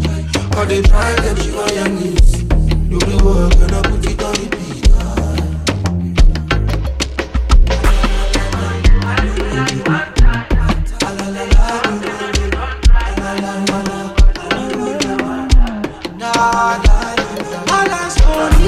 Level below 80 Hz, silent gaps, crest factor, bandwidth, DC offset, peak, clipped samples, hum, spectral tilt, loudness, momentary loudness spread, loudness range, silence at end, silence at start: -14 dBFS; none; 12 dB; 12.5 kHz; under 0.1%; 0 dBFS; under 0.1%; none; -5 dB/octave; -16 LUFS; 6 LU; 2 LU; 0 s; 0 s